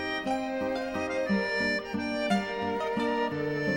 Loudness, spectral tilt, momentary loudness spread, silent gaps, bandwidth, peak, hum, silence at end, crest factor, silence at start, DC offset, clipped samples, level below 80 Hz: -30 LUFS; -5.5 dB/octave; 4 LU; none; 16 kHz; -14 dBFS; none; 0 s; 14 dB; 0 s; under 0.1%; under 0.1%; -58 dBFS